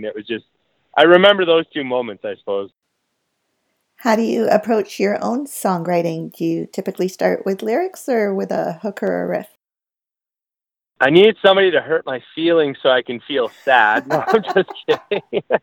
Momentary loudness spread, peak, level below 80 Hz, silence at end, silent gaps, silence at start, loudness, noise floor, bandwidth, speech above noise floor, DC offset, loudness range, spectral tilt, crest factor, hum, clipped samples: 13 LU; 0 dBFS; -68 dBFS; 0.05 s; none; 0 s; -17 LUFS; under -90 dBFS; 18 kHz; over 73 dB; under 0.1%; 6 LU; -5 dB/octave; 18 dB; none; under 0.1%